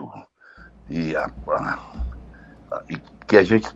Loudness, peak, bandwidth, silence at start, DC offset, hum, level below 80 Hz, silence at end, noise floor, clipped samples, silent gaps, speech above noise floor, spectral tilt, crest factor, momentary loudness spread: -22 LUFS; 0 dBFS; 8 kHz; 0 s; under 0.1%; none; -40 dBFS; 0.05 s; -49 dBFS; under 0.1%; none; 27 dB; -7 dB/octave; 24 dB; 21 LU